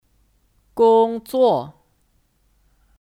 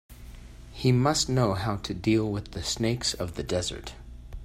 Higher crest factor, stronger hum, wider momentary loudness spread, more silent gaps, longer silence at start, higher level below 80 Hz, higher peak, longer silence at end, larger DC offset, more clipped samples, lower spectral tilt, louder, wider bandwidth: about the same, 16 dB vs 18 dB; neither; second, 18 LU vs 22 LU; neither; first, 0.75 s vs 0.1 s; second, -60 dBFS vs -44 dBFS; first, -6 dBFS vs -10 dBFS; first, 1.35 s vs 0 s; neither; neither; first, -6.5 dB/octave vs -5 dB/octave; first, -18 LUFS vs -27 LUFS; about the same, 15 kHz vs 15.5 kHz